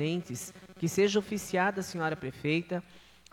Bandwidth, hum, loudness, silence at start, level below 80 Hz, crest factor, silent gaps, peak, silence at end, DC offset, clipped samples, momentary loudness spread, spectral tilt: 17.5 kHz; none; -31 LUFS; 0 s; -64 dBFS; 16 dB; none; -16 dBFS; 0.3 s; under 0.1%; under 0.1%; 12 LU; -5 dB/octave